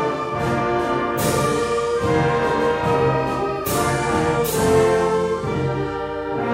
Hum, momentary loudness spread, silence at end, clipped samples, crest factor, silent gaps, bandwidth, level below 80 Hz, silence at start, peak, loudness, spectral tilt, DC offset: none; 6 LU; 0 s; under 0.1%; 14 dB; none; 16 kHz; -42 dBFS; 0 s; -6 dBFS; -20 LUFS; -5.5 dB/octave; under 0.1%